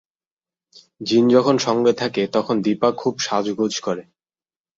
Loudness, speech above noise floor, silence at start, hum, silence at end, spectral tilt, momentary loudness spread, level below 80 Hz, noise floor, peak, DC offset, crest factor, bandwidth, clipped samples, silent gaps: -19 LUFS; over 71 dB; 1 s; none; 0.75 s; -5 dB/octave; 10 LU; -64 dBFS; under -90 dBFS; -2 dBFS; under 0.1%; 18 dB; 7.8 kHz; under 0.1%; none